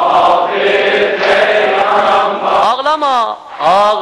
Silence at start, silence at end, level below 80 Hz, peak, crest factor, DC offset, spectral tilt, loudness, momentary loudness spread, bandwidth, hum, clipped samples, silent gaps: 0 s; 0 s; -52 dBFS; -2 dBFS; 10 dB; under 0.1%; -3.5 dB/octave; -11 LUFS; 3 LU; 11.5 kHz; none; under 0.1%; none